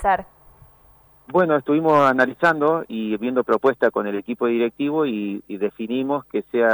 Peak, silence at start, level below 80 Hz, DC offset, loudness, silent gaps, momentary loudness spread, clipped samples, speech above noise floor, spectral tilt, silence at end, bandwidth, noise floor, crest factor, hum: -6 dBFS; 0 s; -50 dBFS; under 0.1%; -21 LUFS; none; 9 LU; under 0.1%; 33 dB; -7 dB/octave; 0 s; over 20 kHz; -53 dBFS; 14 dB; none